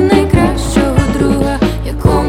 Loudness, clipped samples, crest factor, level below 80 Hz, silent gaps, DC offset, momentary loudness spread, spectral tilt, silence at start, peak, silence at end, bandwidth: -13 LUFS; under 0.1%; 12 dB; -20 dBFS; none; under 0.1%; 5 LU; -6.5 dB/octave; 0 s; 0 dBFS; 0 s; 16 kHz